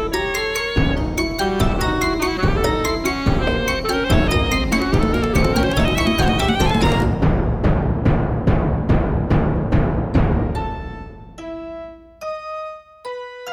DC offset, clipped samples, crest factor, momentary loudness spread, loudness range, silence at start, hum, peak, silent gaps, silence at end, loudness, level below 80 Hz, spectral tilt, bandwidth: under 0.1%; under 0.1%; 14 dB; 14 LU; 5 LU; 0 s; none; -4 dBFS; none; 0 s; -19 LUFS; -24 dBFS; -6 dB/octave; 18 kHz